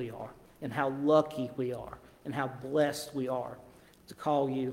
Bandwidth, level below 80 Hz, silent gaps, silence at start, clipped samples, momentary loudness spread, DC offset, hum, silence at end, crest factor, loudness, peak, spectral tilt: 16.5 kHz; -66 dBFS; none; 0 s; under 0.1%; 19 LU; under 0.1%; none; 0 s; 20 dB; -32 LUFS; -12 dBFS; -6 dB/octave